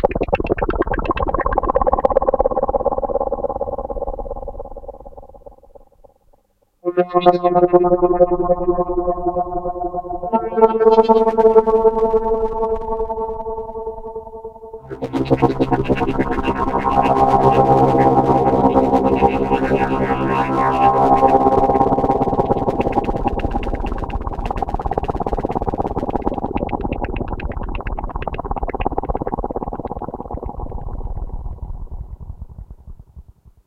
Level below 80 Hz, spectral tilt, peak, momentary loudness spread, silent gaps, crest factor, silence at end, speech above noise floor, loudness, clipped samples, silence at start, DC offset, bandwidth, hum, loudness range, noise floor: -30 dBFS; -8.5 dB/octave; 0 dBFS; 17 LU; none; 18 dB; 0.45 s; 44 dB; -18 LUFS; under 0.1%; 0 s; under 0.1%; 8.4 kHz; none; 12 LU; -59 dBFS